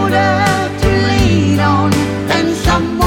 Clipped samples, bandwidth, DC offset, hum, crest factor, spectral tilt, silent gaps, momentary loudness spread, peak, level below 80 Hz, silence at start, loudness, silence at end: under 0.1%; 17 kHz; under 0.1%; none; 12 dB; -5.5 dB/octave; none; 3 LU; 0 dBFS; -24 dBFS; 0 s; -13 LUFS; 0 s